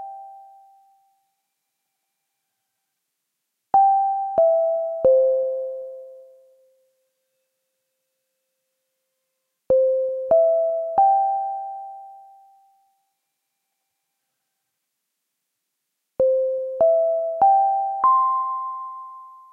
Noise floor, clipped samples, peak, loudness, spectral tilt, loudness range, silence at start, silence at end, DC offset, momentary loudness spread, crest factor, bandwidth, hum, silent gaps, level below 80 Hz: -79 dBFS; under 0.1%; -8 dBFS; -20 LUFS; -8.5 dB/octave; 9 LU; 0 s; 0.2 s; under 0.1%; 19 LU; 16 dB; 2.2 kHz; none; none; -66 dBFS